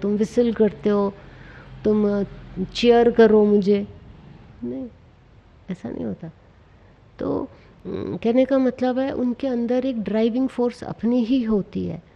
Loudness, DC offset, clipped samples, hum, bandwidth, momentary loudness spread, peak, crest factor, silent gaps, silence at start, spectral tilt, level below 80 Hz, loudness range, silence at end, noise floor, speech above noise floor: -21 LUFS; under 0.1%; under 0.1%; none; 8.6 kHz; 18 LU; -4 dBFS; 18 dB; none; 0 s; -7.5 dB/octave; -50 dBFS; 13 LU; 0.15 s; -51 dBFS; 30 dB